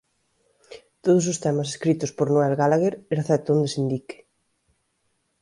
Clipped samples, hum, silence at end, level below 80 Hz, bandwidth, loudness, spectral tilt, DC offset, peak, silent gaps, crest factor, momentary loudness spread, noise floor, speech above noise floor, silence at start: under 0.1%; none; 1.3 s; -66 dBFS; 11.5 kHz; -23 LUFS; -6 dB/octave; under 0.1%; -8 dBFS; none; 16 dB; 8 LU; -72 dBFS; 50 dB; 0.7 s